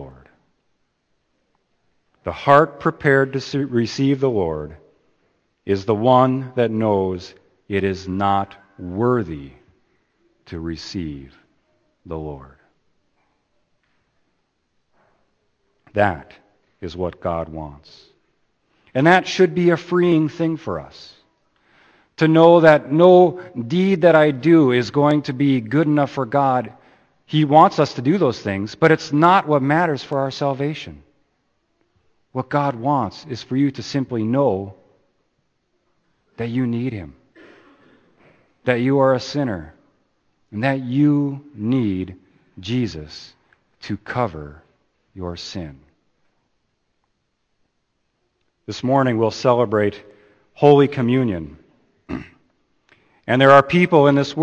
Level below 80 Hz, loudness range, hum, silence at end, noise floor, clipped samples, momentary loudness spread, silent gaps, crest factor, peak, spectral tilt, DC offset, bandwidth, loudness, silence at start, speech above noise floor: -52 dBFS; 15 LU; none; 0 s; -71 dBFS; under 0.1%; 19 LU; none; 20 dB; 0 dBFS; -7 dB/octave; under 0.1%; 8.6 kHz; -18 LUFS; 0 s; 53 dB